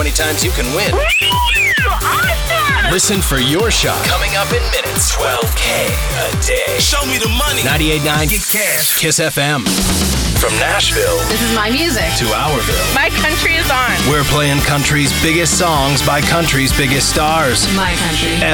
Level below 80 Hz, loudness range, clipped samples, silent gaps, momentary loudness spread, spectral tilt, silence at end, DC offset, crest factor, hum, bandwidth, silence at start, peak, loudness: -22 dBFS; 2 LU; under 0.1%; none; 3 LU; -3 dB/octave; 0 s; under 0.1%; 12 dB; none; over 20 kHz; 0 s; -2 dBFS; -13 LUFS